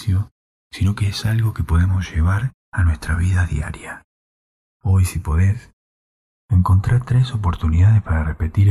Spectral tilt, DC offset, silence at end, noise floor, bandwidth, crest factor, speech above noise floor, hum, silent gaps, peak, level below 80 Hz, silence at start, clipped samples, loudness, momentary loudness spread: -6.5 dB/octave; under 0.1%; 0 s; under -90 dBFS; 12.5 kHz; 12 dB; over 73 dB; none; 0.31-0.70 s, 2.54-2.72 s, 4.04-4.80 s, 5.73-6.48 s; -6 dBFS; -28 dBFS; 0 s; under 0.1%; -19 LUFS; 12 LU